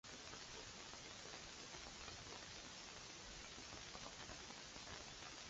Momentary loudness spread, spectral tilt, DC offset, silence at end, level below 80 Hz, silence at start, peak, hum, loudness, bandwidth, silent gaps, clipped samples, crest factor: 1 LU; -1.5 dB/octave; under 0.1%; 0 s; -68 dBFS; 0.05 s; -36 dBFS; none; -53 LUFS; 8 kHz; none; under 0.1%; 20 dB